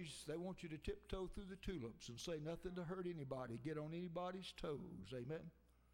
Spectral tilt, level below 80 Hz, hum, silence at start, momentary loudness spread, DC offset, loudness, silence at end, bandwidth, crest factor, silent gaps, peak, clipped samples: -5.5 dB/octave; -62 dBFS; none; 0 s; 4 LU; under 0.1%; -50 LUFS; 0.15 s; 16 kHz; 18 dB; none; -32 dBFS; under 0.1%